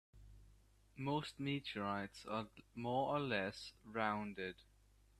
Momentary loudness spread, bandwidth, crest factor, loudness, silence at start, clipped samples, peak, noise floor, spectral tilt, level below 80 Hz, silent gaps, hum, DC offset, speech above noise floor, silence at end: 11 LU; 13.5 kHz; 22 dB; -43 LUFS; 0.15 s; under 0.1%; -22 dBFS; -68 dBFS; -6 dB/octave; -68 dBFS; none; none; under 0.1%; 26 dB; 0.6 s